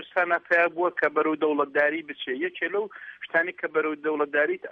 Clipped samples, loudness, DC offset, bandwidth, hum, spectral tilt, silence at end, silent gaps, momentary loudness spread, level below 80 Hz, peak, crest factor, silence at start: under 0.1%; -25 LUFS; under 0.1%; 6 kHz; none; -6 dB/octave; 0 s; none; 8 LU; -76 dBFS; -10 dBFS; 16 dB; 0 s